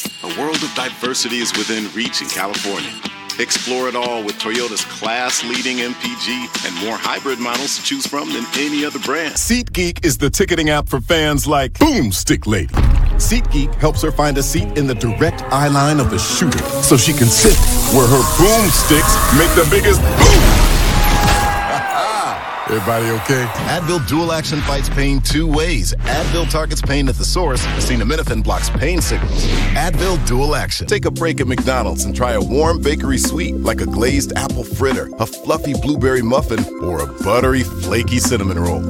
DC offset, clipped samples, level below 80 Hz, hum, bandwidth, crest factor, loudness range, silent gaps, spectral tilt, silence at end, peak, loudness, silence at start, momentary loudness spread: under 0.1%; under 0.1%; -20 dBFS; none; 17.5 kHz; 16 dB; 8 LU; none; -4 dB/octave; 0 s; 0 dBFS; -16 LUFS; 0 s; 9 LU